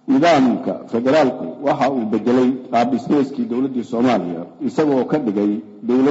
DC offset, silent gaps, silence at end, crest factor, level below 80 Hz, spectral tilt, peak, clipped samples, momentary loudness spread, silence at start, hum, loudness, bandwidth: under 0.1%; none; 0 s; 12 dB; -62 dBFS; -6.5 dB/octave; -4 dBFS; under 0.1%; 8 LU; 0.05 s; none; -18 LUFS; 8 kHz